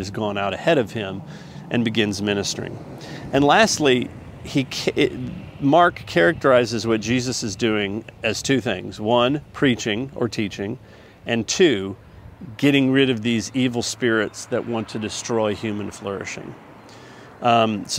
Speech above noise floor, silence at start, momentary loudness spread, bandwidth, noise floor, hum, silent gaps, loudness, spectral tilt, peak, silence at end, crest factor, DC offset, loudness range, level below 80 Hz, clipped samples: 22 dB; 0 s; 16 LU; 16 kHz; -43 dBFS; none; none; -21 LUFS; -4.5 dB/octave; 0 dBFS; 0 s; 20 dB; under 0.1%; 5 LU; -52 dBFS; under 0.1%